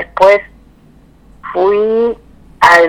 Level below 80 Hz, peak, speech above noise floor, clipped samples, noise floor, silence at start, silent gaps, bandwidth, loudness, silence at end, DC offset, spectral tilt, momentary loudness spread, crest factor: -44 dBFS; 0 dBFS; 33 dB; 1%; -44 dBFS; 0 s; none; 18 kHz; -12 LUFS; 0 s; under 0.1%; -4 dB/octave; 16 LU; 12 dB